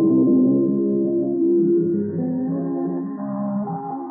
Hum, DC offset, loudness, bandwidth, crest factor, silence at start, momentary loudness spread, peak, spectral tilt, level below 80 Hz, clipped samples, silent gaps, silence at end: none; under 0.1%; -21 LUFS; 2 kHz; 12 dB; 0 s; 10 LU; -8 dBFS; -10 dB/octave; -72 dBFS; under 0.1%; none; 0 s